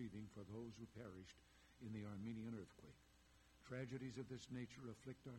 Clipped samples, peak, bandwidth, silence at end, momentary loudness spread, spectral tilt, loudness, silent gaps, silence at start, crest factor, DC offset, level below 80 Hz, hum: under 0.1%; -38 dBFS; 16 kHz; 0 s; 12 LU; -6.5 dB/octave; -55 LUFS; none; 0 s; 18 dB; under 0.1%; -76 dBFS; none